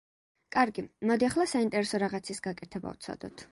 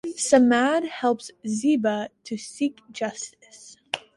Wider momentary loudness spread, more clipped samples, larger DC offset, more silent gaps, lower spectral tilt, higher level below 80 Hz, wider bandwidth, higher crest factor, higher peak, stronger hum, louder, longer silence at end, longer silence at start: second, 13 LU vs 16 LU; neither; neither; neither; about the same, -4.5 dB/octave vs -3.5 dB/octave; about the same, -64 dBFS vs -68 dBFS; about the same, 11.5 kHz vs 11.5 kHz; about the same, 20 dB vs 20 dB; second, -10 dBFS vs -4 dBFS; neither; second, -30 LUFS vs -24 LUFS; about the same, 0.05 s vs 0.15 s; first, 0.5 s vs 0.05 s